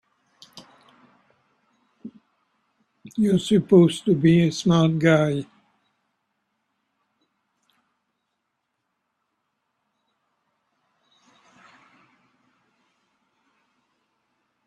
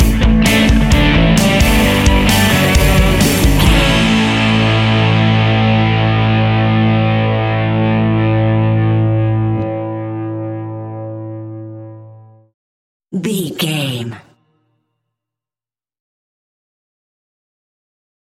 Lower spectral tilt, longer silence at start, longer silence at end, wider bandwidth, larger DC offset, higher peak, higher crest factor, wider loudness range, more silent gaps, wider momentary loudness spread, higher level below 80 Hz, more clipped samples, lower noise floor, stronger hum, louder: first, -7 dB/octave vs -5.5 dB/octave; first, 0.55 s vs 0 s; first, 9.25 s vs 4.1 s; second, 10.5 kHz vs 17 kHz; neither; second, -4 dBFS vs 0 dBFS; first, 22 dB vs 14 dB; second, 10 LU vs 14 LU; second, none vs 12.54-13.00 s; first, 28 LU vs 15 LU; second, -62 dBFS vs -22 dBFS; neither; second, -78 dBFS vs under -90 dBFS; neither; second, -20 LUFS vs -13 LUFS